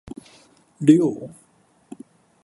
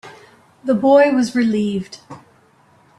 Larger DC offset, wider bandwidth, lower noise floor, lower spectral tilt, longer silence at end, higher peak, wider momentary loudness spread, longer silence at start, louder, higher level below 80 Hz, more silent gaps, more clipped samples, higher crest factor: neither; about the same, 11.5 kHz vs 11.5 kHz; first, -59 dBFS vs -53 dBFS; first, -7.5 dB/octave vs -6 dB/octave; first, 1.15 s vs 0.8 s; about the same, -2 dBFS vs -2 dBFS; first, 27 LU vs 19 LU; first, 0.8 s vs 0.05 s; about the same, -18 LUFS vs -16 LUFS; about the same, -62 dBFS vs -60 dBFS; neither; neither; first, 22 dB vs 16 dB